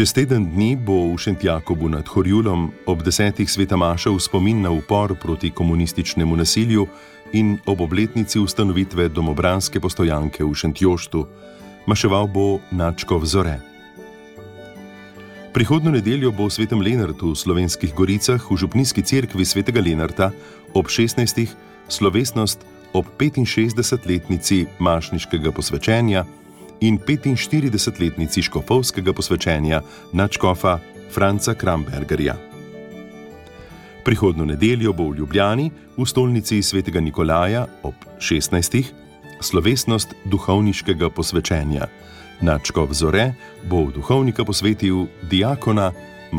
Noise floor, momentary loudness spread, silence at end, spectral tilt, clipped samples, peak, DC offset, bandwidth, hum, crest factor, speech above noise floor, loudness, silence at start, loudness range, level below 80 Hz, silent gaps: -40 dBFS; 8 LU; 0 s; -5 dB/octave; under 0.1%; -4 dBFS; under 0.1%; 17 kHz; none; 16 dB; 22 dB; -19 LUFS; 0 s; 2 LU; -36 dBFS; none